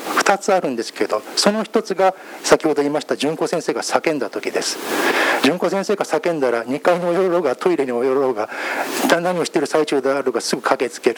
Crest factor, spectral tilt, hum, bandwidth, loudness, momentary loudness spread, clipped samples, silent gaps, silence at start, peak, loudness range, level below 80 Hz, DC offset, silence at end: 18 dB; -3.5 dB/octave; none; over 20 kHz; -19 LUFS; 5 LU; under 0.1%; none; 0 s; 0 dBFS; 1 LU; -68 dBFS; under 0.1%; 0 s